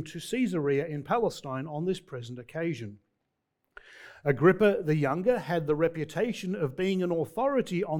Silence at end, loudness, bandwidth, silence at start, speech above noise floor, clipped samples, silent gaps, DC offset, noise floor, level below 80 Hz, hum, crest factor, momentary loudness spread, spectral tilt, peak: 0 s; -29 LUFS; 18 kHz; 0 s; 53 dB; under 0.1%; none; under 0.1%; -81 dBFS; -62 dBFS; none; 20 dB; 13 LU; -7 dB/octave; -8 dBFS